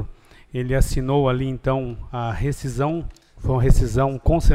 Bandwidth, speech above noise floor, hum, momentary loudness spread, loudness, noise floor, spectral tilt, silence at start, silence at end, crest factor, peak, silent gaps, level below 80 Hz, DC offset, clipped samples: 15 kHz; 21 dB; none; 11 LU; -23 LUFS; -40 dBFS; -7 dB/octave; 0 s; 0 s; 18 dB; -2 dBFS; none; -26 dBFS; under 0.1%; under 0.1%